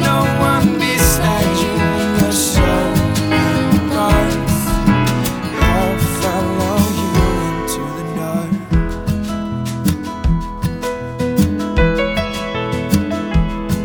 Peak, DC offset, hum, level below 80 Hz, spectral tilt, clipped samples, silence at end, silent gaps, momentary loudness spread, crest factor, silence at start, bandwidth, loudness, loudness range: 0 dBFS; under 0.1%; none; -24 dBFS; -5 dB/octave; under 0.1%; 0 s; none; 7 LU; 14 dB; 0 s; over 20 kHz; -16 LUFS; 5 LU